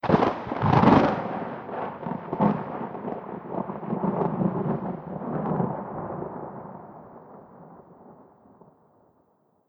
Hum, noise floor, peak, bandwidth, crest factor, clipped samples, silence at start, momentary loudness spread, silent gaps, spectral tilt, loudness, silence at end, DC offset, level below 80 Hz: none; -66 dBFS; -4 dBFS; 6.8 kHz; 24 dB; under 0.1%; 0.05 s; 21 LU; none; -9 dB/octave; -26 LUFS; 1.45 s; under 0.1%; -54 dBFS